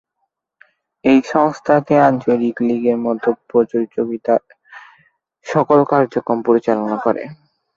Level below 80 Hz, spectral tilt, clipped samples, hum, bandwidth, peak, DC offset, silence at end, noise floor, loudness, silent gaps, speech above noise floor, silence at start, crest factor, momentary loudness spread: -60 dBFS; -7.5 dB/octave; under 0.1%; none; 7.4 kHz; 0 dBFS; under 0.1%; 0.4 s; -73 dBFS; -16 LUFS; none; 57 dB; 1.05 s; 16 dB; 7 LU